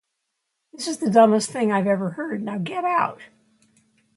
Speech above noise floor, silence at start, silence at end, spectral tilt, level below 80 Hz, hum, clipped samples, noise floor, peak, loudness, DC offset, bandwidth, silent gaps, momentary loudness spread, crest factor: 57 dB; 0.8 s; 0.9 s; -5.5 dB/octave; -70 dBFS; none; under 0.1%; -78 dBFS; -2 dBFS; -22 LUFS; under 0.1%; 11.5 kHz; none; 12 LU; 22 dB